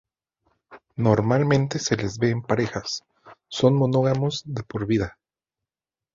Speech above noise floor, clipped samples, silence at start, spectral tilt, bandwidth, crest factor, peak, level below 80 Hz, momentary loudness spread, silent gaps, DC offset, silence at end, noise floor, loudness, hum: over 68 dB; under 0.1%; 0.7 s; -6 dB/octave; 7.6 kHz; 20 dB; -4 dBFS; -52 dBFS; 12 LU; none; under 0.1%; 1.05 s; under -90 dBFS; -23 LUFS; none